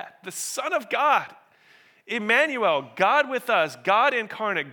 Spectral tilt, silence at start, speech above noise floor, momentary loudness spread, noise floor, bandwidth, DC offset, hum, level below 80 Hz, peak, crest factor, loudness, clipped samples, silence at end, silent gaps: -2.5 dB/octave; 0 s; 33 dB; 10 LU; -57 dBFS; 19.5 kHz; under 0.1%; none; -86 dBFS; -4 dBFS; 20 dB; -23 LUFS; under 0.1%; 0 s; none